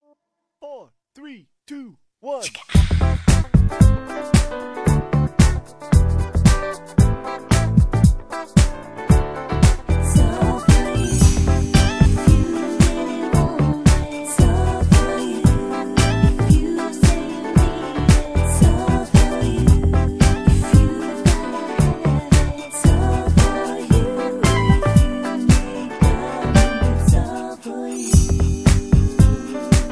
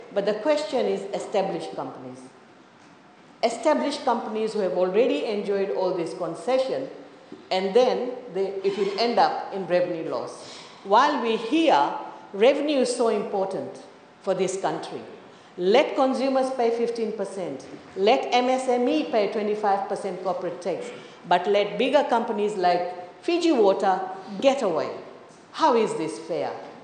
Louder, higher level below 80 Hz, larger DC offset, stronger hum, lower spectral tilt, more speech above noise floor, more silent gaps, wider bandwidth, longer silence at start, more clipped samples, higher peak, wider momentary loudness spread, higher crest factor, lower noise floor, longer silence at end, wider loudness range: first, -18 LUFS vs -24 LUFS; first, -20 dBFS vs -80 dBFS; first, 0.3% vs under 0.1%; neither; first, -6 dB/octave vs -4.5 dB/octave; first, 50 dB vs 28 dB; neither; first, 11 kHz vs 9.6 kHz; first, 0.65 s vs 0 s; neither; first, 0 dBFS vs -6 dBFS; second, 8 LU vs 14 LU; about the same, 16 dB vs 18 dB; first, -68 dBFS vs -51 dBFS; about the same, 0 s vs 0 s; about the same, 2 LU vs 3 LU